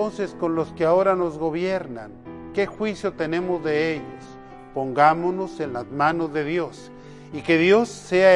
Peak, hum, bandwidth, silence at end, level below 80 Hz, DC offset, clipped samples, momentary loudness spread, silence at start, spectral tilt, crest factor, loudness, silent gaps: -2 dBFS; none; 11.5 kHz; 0 s; -54 dBFS; under 0.1%; under 0.1%; 21 LU; 0 s; -6 dB/octave; 20 dB; -23 LUFS; none